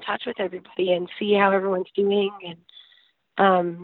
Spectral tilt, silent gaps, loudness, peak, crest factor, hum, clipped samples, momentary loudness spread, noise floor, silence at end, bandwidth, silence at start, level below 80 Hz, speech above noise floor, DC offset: -10 dB/octave; none; -23 LUFS; -4 dBFS; 20 dB; none; under 0.1%; 11 LU; -60 dBFS; 0 s; 4.3 kHz; 0 s; -70 dBFS; 37 dB; under 0.1%